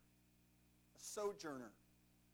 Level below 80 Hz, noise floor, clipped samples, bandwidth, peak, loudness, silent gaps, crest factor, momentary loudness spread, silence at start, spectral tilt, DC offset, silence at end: -80 dBFS; -74 dBFS; under 0.1%; over 20 kHz; -32 dBFS; -49 LUFS; none; 20 dB; 10 LU; 0.95 s; -3 dB/octave; under 0.1%; 0.55 s